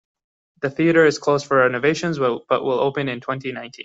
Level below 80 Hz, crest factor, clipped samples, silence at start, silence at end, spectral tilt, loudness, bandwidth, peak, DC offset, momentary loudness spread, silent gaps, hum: -62 dBFS; 16 dB; under 0.1%; 0.6 s; 0 s; -5.5 dB/octave; -20 LUFS; 8 kHz; -4 dBFS; under 0.1%; 12 LU; none; none